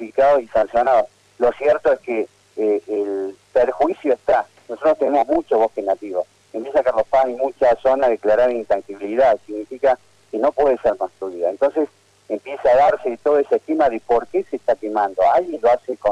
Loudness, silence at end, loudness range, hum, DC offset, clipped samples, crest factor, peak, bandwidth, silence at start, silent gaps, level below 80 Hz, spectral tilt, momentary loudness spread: -19 LUFS; 0 s; 2 LU; none; under 0.1%; under 0.1%; 10 dB; -8 dBFS; 9.8 kHz; 0 s; none; -52 dBFS; -6 dB/octave; 9 LU